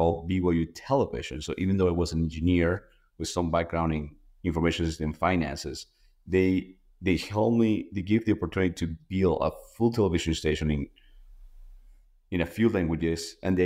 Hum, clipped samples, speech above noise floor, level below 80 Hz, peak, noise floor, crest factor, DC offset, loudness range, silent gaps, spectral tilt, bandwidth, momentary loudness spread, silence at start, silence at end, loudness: none; under 0.1%; 29 dB; -44 dBFS; -12 dBFS; -56 dBFS; 16 dB; under 0.1%; 3 LU; none; -6.5 dB/octave; 15.5 kHz; 9 LU; 0 s; 0 s; -28 LUFS